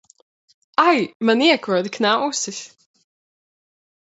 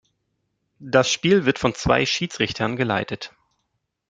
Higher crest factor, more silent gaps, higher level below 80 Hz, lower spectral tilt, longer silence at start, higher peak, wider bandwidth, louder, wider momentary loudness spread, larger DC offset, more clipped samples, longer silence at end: about the same, 20 dB vs 22 dB; first, 1.15-1.20 s vs none; second, -74 dBFS vs -48 dBFS; second, -3 dB/octave vs -4.5 dB/octave; about the same, 0.8 s vs 0.8 s; about the same, -2 dBFS vs -2 dBFS; second, 8.2 kHz vs 9.4 kHz; first, -18 LUFS vs -21 LUFS; about the same, 9 LU vs 9 LU; neither; neither; first, 1.45 s vs 0.8 s